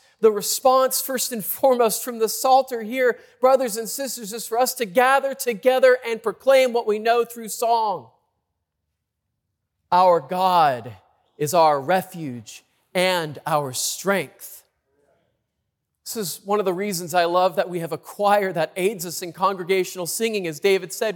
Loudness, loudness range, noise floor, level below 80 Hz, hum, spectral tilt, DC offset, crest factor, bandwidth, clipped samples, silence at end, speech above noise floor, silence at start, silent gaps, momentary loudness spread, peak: -21 LUFS; 6 LU; -79 dBFS; -74 dBFS; none; -3 dB/octave; under 0.1%; 16 dB; 18 kHz; under 0.1%; 0 s; 58 dB; 0.2 s; none; 11 LU; -6 dBFS